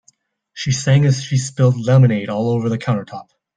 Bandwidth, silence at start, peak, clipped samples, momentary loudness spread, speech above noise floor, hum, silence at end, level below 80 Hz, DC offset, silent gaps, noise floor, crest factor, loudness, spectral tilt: 9.4 kHz; 0.55 s; -2 dBFS; under 0.1%; 11 LU; 42 dB; none; 0.35 s; -54 dBFS; under 0.1%; none; -58 dBFS; 14 dB; -17 LUFS; -6.5 dB/octave